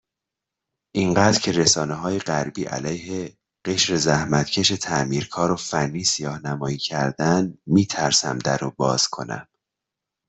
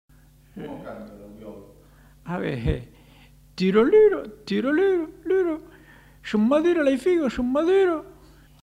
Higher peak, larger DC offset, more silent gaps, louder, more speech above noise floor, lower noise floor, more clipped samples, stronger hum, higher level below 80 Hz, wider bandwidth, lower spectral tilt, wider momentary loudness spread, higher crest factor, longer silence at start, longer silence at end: first, -4 dBFS vs -8 dBFS; neither; neither; about the same, -21 LUFS vs -22 LUFS; first, 63 dB vs 30 dB; first, -85 dBFS vs -52 dBFS; neither; neither; second, -54 dBFS vs -44 dBFS; second, 8.4 kHz vs 11.5 kHz; second, -3.5 dB/octave vs -7 dB/octave; second, 10 LU vs 22 LU; about the same, 20 dB vs 16 dB; first, 0.95 s vs 0.55 s; first, 0.85 s vs 0.55 s